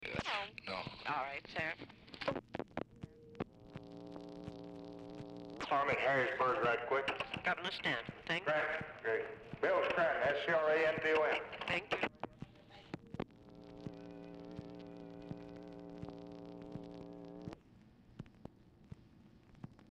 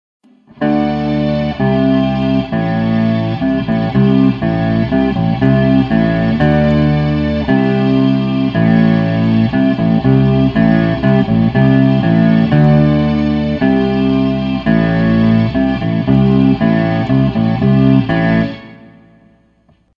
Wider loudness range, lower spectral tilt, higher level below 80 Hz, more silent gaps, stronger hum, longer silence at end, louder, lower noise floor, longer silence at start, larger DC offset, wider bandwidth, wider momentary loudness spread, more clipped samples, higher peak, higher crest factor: first, 17 LU vs 3 LU; second, -5.5 dB/octave vs -9.5 dB/octave; second, -68 dBFS vs -32 dBFS; neither; neither; second, 0.1 s vs 1.25 s; second, -37 LUFS vs -13 LUFS; first, -63 dBFS vs -53 dBFS; second, 0 s vs 0.6 s; neither; first, 11 kHz vs 5.6 kHz; first, 21 LU vs 5 LU; neither; second, -20 dBFS vs 0 dBFS; first, 20 dB vs 12 dB